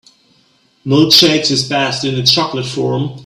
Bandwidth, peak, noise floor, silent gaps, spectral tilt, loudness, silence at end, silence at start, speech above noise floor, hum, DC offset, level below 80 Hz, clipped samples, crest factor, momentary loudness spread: over 20 kHz; 0 dBFS; -54 dBFS; none; -4 dB/octave; -12 LUFS; 0 s; 0.85 s; 41 dB; none; under 0.1%; -52 dBFS; 0.1%; 14 dB; 11 LU